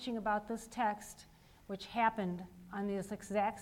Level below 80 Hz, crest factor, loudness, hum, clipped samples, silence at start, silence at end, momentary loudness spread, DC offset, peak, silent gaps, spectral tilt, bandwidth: -66 dBFS; 20 dB; -38 LUFS; none; under 0.1%; 0 s; 0 s; 13 LU; under 0.1%; -18 dBFS; none; -5 dB/octave; 17 kHz